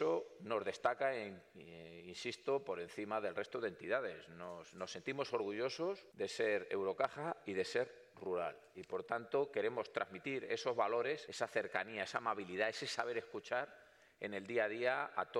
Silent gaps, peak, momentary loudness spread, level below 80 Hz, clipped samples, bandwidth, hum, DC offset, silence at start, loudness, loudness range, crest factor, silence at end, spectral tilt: none; -22 dBFS; 11 LU; -84 dBFS; under 0.1%; 12.5 kHz; none; under 0.1%; 0 s; -41 LUFS; 3 LU; 20 dB; 0 s; -4 dB/octave